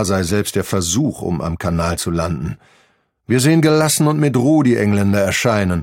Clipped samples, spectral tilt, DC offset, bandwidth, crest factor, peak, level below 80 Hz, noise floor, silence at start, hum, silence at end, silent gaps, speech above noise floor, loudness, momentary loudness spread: under 0.1%; -5 dB/octave; under 0.1%; 17 kHz; 16 dB; 0 dBFS; -40 dBFS; -59 dBFS; 0 s; none; 0 s; none; 43 dB; -16 LUFS; 9 LU